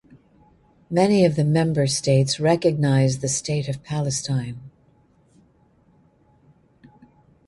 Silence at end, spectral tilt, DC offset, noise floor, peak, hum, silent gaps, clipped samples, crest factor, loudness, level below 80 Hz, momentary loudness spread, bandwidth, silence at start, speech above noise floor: 2.8 s; -5.5 dB/octave; under 0.1%; -58 dBFS; -4 dBFS; none; none; under 0.1%; 18 dB; -21 LUFS; -56 dBFS; 9 LU; 11.5 kHz; 0.9 s; 38 dB